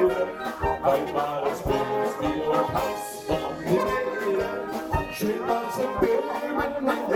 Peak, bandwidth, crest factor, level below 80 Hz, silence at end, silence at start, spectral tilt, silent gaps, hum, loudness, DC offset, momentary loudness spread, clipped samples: -8 dBFS; 20 kHz; 18 dB; -44 dBFS; 0 s; 0 s; -5.5 dB/octave; none; none; -26 LUFS; under 0.1%; 5 LU; under 0.1%